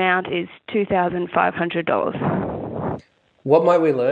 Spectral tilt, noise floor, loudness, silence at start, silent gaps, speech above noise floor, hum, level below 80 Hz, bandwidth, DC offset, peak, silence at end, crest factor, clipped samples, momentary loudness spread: -8 dB/octave; -45 dBFS; -21 LUFS; 0 s; none; 25 dB; none; -52 dBFS; 7.8 kHz; under 0.1%; -2 dBFS; 0 s; 18 dB; under 0.1%; 11 LU